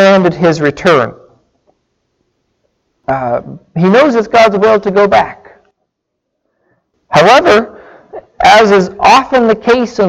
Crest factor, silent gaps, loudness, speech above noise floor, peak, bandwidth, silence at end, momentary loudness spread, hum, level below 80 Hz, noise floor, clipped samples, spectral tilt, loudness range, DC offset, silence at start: 10 dB; none; -9 LUFS; 63 dB; 0 dBFS; 14 kHz; 0 s; 12 LU; none; -44 dBFS; -71 dBFS; 0.1%; -5.5 dB/octave; 7 LU; under 0.1%; 0 s